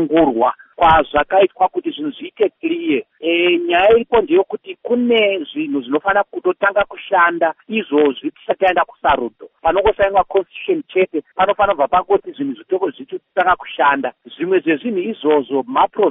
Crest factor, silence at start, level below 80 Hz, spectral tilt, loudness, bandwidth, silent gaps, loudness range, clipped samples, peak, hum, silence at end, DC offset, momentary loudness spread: 14 dB; 0 s; -44 dBFS; -2 dB/octave; -17 LUFS; 3.9 kHz; none; 2 LU; under 0.1%; -2 dBFS; none; 0 s; under 0.1%; 9 LU